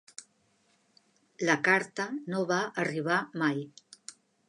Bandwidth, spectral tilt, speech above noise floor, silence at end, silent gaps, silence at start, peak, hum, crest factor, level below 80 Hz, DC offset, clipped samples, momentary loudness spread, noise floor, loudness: 11 kHz; -4.5 dB/octave; 40 dB; 0.35 s; none; 0.2 s; -10 dBFS; none; 22 dB; -82 dBFS; under 0.1%; under 0.1%; 22 LU; -70 dBFS; -29 LUFS